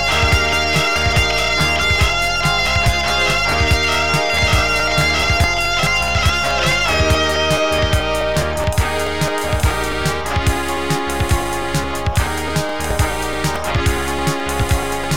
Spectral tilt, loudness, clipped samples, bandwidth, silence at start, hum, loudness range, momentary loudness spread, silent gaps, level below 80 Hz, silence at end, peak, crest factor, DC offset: -3.5 dB/octave; -16 LUFS; under 0.1%; 17 kHz; 0 s; none; 5 LU; 5 LU; none; -26 dBFS; 0 s; -2 dBFS; 14 dB; 3%